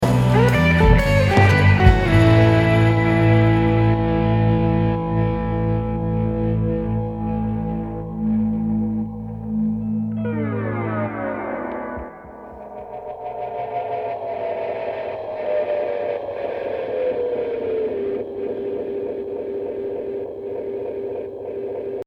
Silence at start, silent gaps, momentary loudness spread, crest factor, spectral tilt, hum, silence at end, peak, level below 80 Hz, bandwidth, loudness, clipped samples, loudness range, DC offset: 0 s; none; 14 LU; 20 dB; -8 dB/octave; none; 0.05 s; 0 dBFS; -30 dBFS; 11.5 kHz; -20 LUFS; under 0.1%; 13 LU; under 0.1%